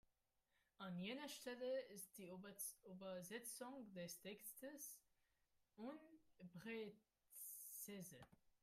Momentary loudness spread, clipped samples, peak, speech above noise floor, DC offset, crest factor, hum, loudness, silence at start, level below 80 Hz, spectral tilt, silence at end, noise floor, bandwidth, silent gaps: 9 LU; under 0.1%; -36 dBFS; 33 dB; under 0.1%; 20 dB; none; -54 LUFS; 0.8 s; under -90 dBFS; -3.5 dB/octave; 0.1 s; -87 dBFS; 16 kHz; none